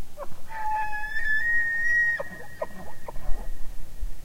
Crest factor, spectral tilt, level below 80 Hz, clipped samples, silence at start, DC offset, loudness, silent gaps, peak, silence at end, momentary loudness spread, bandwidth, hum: 14 dB; -4 dB/octave; -36 dBFS; under 0.1%; 0 s; under 0.1%; -26 LUFS; none; -8 dBFS; 0 s; 20 LU; 15.5 kHz; none